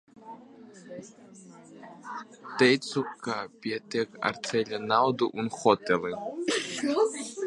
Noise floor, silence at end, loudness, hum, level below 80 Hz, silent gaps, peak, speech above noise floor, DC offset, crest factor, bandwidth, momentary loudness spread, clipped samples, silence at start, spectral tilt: -50 dBFS; 0 s; -28 LUFS; none; -72 dBFS; none; -6 dBFS; 21 dB; under 0.1%; 24 dB; 11.5 kHz; 23 LU; under 0.1%; 0.2 s; -4 dB/octave